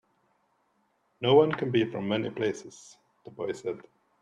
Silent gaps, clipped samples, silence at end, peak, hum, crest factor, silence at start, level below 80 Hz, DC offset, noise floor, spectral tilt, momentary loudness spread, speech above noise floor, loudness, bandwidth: none; under 0.1%; 0.4 s; -10 dBFS; none; 20 dB; 1.2 s; -70 dBFS; under 0.1%; -72 dBFS; -6 dB/octave; 18 LU; 45 dB; -28 LUFS; 9.8 kHz